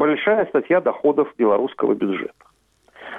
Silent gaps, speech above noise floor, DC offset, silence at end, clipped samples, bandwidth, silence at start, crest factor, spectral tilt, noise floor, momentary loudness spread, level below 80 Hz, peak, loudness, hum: none; 34 dB; under 0.1%; 0 s; under 0.1%; 3.9 kHz; 0 s; 12 dB; -8 dB/octave; -53 dBFS; 6 LU; -64 dBFS; -8 dBFS; -20 LUFS; none